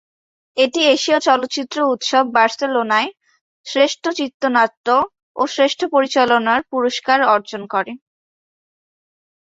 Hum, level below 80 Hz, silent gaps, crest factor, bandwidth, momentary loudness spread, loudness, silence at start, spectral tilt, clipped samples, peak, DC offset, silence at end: none; -66 dBFS; 3.41-3.64 s, 4.34-4.40 s, 4.77-4.84 s, 5.23-5.35 s; 16 dB; 8 kHz; 9 LU; -17 LUFS; 0.55 s; -2.5 dB/octave; under 0.1%; -2 dBFS; under 0.1%; 1.6 s